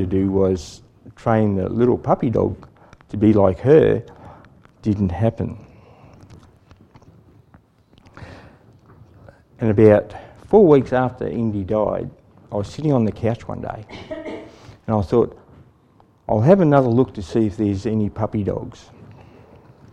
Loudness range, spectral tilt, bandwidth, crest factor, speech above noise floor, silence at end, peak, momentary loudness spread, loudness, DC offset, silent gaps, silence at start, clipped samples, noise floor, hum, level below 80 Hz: 9 LU; -9 dB/octave; 9.2 kHz; 20 dB; 37 dB; 0.8 s; 0 dBFS; 20 LU; -19 LUFS; under 0.1%; none; 0 s; under 0.1%; -54 dBFS; none; -48 dBFS